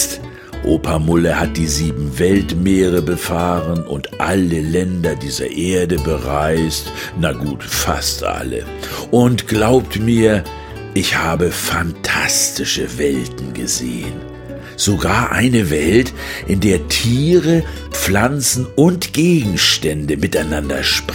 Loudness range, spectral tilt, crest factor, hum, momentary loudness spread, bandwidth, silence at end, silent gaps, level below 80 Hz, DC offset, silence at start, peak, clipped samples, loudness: 4 LU; -4.5 dB/octave; 16 dB; none; 10 LU; 17 kHz; 0 s; none; -32 dBFS; under 0.1%; 0 s; 0 dBFS; under 0.1%; -16 LUFS